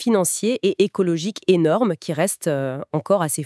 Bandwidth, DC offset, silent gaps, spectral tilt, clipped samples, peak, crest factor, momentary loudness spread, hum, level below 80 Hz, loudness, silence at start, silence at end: 12 kHz; under 0.1%; none; -5 dB/octave; under 0.1%; -4 dBFS; 16 dB; 5 LU; none; -74 dBFS; -20 LUFS; 0 s; 0 s